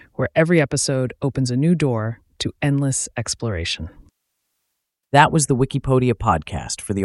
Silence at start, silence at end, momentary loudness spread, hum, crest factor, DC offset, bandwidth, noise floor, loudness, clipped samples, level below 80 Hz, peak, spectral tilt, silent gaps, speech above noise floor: 0.2 s; 0 s; 11 LU; none; 20 dB; under 0.1%; 12 kHz; -77 dBFS; -20 LUFS; under 0.1%; -42 dBFS; 0 dBFS; -5 dB/octave; none; 58 dB